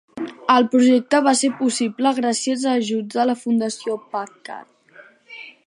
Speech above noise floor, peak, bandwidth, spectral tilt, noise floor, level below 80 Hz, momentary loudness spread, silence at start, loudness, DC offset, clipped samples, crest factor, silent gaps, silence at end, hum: 30 dB; -2 dBFS; 11 kHz; -3.5 dB/octave; -49 dBFS; -72 dBFS; 21 LU; 0.15 s; -19 LUFS; under 0.1%; under 0.1%; 18 dB; none; 0.15 s; none